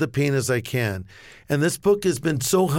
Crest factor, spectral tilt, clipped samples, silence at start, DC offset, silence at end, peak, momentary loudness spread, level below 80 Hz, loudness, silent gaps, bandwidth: 14 dB; -5 dB/octave; under 0.1%; 0 s; under 0.1%; 0 s; -8 dBFS; 7 LU; -52 dBFS; -22 LUFS; none; 17 kHz